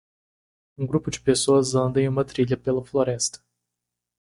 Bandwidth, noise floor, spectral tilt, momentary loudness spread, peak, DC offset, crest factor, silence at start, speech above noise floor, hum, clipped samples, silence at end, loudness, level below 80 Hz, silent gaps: 11.5 kHz; -84 dBFS; -5 dB/octave; 7 LU; -6 dBFS; under 0.1%; 18 dB; 0.8 s; 61 dB; 60 Hz at -40 dBFS; under 0.1%; 0.85 s; -23 LUFS; -54 dBFS; none